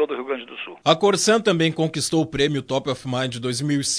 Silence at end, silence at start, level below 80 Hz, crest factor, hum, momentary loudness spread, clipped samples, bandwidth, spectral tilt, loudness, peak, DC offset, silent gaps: 0 s; 0 s; -52 dBFS; 20 dB; none; 9 LU; under 0.1%; 11 kHz; -4 dB/octave; -21 LUFS; -2 dBFS; under 0.1%; none